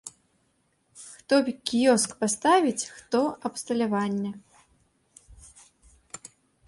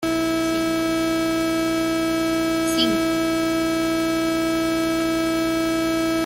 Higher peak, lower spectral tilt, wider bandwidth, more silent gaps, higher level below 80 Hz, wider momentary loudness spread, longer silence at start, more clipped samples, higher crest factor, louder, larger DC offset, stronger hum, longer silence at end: about the same, -8 dBFS vs -8 dBFS; about the same, -3.5 dB/octave vs -4 dB/octave; second, 11.5 kHz vs 16.5 kHz; neither; second, -64 dBFS vs -46 dBFS; first, 23 LU vs 2 LU; about the same, 0.05 s vs 0 s; neither; first, 20 dB vs 14 dB; second, -25 LUFS vs -21 LUFS; neither; second, none vs 60 Hz at -40 dBFS; first, 1.35 s vs 0 s